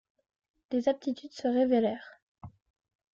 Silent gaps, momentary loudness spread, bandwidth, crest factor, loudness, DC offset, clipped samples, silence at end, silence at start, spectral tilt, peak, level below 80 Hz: 2.22-2.35 s; 10 LU; 7.4 kHz; 18 dB; -30 LUFS; under 0.1%; under 0.1%; 0.65 s; 0.7 s; -6.5 dB/octave; -14 dBFS; -70 dBFS